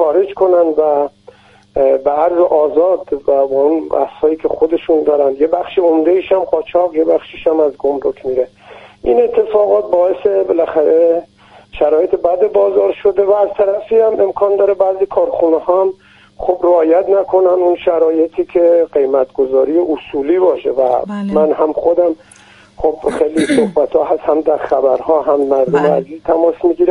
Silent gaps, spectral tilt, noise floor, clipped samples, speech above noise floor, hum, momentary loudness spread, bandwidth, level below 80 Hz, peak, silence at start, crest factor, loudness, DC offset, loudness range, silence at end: none; -7 dB/octave; -43 dBFS; under 0.1%; 30 dB; none; 5 LU; 11 kHz; -46 dBFS; 0 dBFS; 0 s; 12 dB; -13 LUFS; under 0.1%; 2 LU; 0 s